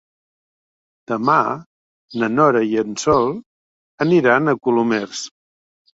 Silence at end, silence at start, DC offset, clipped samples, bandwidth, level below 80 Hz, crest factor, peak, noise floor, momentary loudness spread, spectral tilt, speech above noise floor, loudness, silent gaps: 0.65 s; 1.1 s; under 0.1%; under 0.1%; 8 kHz; -56 dBFS; 18 dB; -2 dBFS; under -90 dBFS; 15 LU; -5.5 dB/octave; over 73 dB; -18 LUFS; 1.66-2.08 s, 3.46-3.98 s